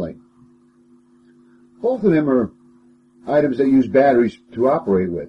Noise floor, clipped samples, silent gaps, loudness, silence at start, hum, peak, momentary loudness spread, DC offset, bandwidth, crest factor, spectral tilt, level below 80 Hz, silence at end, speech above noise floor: -53 dBFS; under 0.1%; none; -18 LUFS; 0 s; none; -4 dBFS; 11 LU; under 0.1%; 6 kHz; 16 dB; -9 dB/octave; -54 dBFS; 0 s; 36 dB